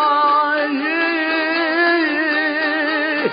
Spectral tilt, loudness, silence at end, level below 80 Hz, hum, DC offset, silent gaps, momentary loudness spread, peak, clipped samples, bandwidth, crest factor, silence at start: -8 dB/octave; -17 LUFS; 0 s; -72 dBFS; none; under 0.1%; none; 3 LU; -6 dBFS; under 0.1%; 5.2 kHz; 12 dB; 0 s